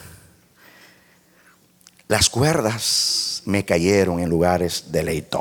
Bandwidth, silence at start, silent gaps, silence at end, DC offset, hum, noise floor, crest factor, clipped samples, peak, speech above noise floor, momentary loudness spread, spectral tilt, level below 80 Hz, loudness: 19 kHz; 0 s; none; 0 s; under 0.1%; none; -55 dBFS; 20 dB; under 0.1%; -2 dBFS; 35 dB; 6 LU; -3.5 dB/octave; -44 dBFS; -19 LUFS